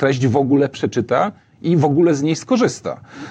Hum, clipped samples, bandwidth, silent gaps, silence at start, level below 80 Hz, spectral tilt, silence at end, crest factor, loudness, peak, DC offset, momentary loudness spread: none; under 0.1%; 9.4 kHz; none; 0 s; -60 dBFS; -6.5 dB/octave; 0 s; 16 dB; -17 LUFS; -2 dBFS; under 0.1%; 11 LU